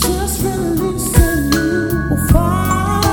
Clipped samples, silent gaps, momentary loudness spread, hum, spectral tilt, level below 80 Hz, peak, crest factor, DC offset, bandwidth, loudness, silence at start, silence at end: under 0.1%; none; 4 LU; none; -5 dB/octave; -22 dBFS; 0 dBFS; 14 dB; under 0.1%; 17.5 kHz; -15 LUFS; 0 s; 0 s